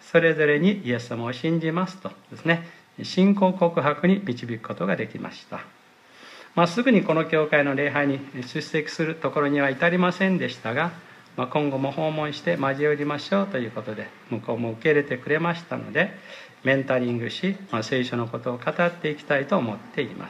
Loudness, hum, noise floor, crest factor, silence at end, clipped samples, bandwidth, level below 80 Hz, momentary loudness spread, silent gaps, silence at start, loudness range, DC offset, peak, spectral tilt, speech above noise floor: -24 LUFS; none; -51 dBFS; 18 dB; 0 s; under 0.1%; 11 kHz; -72 dBFS; 12 LU; none; 0.05 s; 3 LU; under 0.1%; -6 dBFS; -6.5 dB/octave; 27 dB